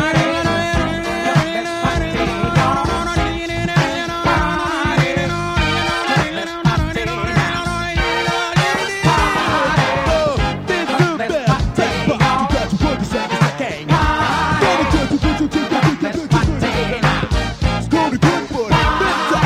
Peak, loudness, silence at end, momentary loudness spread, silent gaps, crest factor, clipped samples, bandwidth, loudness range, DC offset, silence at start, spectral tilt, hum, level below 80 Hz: 0 dBFS; -17 LUFS; 0 s; 4 LU; none; 16 dB; under 0.1%; 15 kHz; 1 LU; under 0.1%; 0 s; -5.5 dB/octave; none; -28 dBFS